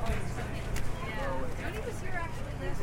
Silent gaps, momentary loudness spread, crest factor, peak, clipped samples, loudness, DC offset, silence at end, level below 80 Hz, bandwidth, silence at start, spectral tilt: none; 3 LU; 14 dB; -18 dBFS; under 0.1%; -37 LUFS; under 0.1%; 0 s; -38 dBFS; 16 kHz; 0 s; -5.5 dB/octave